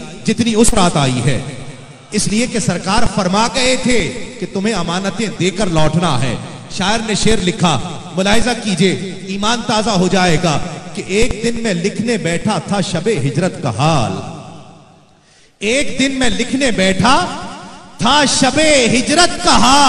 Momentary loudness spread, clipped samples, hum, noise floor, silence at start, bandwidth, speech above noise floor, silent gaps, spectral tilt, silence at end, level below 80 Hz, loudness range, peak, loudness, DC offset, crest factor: 12 LU; under 0.1%; none; -48 dBFS; 0 s; 13 kHz; 35 dB; none; -4 dB/octave; 0 s; -32 dBFS; 4 LU; 0 dBFS; -15 LUFS; under 0.1%; 14 dB